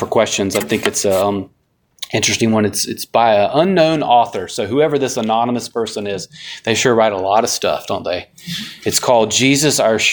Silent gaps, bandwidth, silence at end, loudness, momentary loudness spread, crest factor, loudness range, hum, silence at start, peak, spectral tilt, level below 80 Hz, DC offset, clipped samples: none; 19.5 kHz; 0 s; -16 LUFS; 12 LU; 16 dB; 3 LU; none; 0 s; 0 dBFS; -3.5 dB/octave; -54 dBFS; under 0.1%; under 0.1%